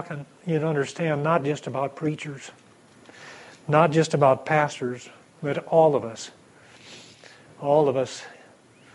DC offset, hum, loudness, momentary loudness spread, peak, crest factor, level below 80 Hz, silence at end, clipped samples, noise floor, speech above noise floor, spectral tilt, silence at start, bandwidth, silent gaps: under 0.1%; none; -24 LUFS; 24 LU; -4 dBFS; 20 dB; -70 dBFS; 0.6 s; under 0.1%; -53 dBFS; 30 dB; -6 dB/octave; 0 s; 11.5 kHz; none